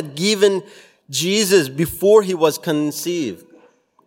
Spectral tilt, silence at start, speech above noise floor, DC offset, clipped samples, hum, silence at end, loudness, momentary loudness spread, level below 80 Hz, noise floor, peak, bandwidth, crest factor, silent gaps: -4 dB/octave; 0 s; 36 dB; under 0.1%; under 0.1%; none; 0.7 s; -18 LUFS; 11 LU; -54 dBFS; -53 dBFS; 0 dBFS; 16.5 kHz; 18 dB; none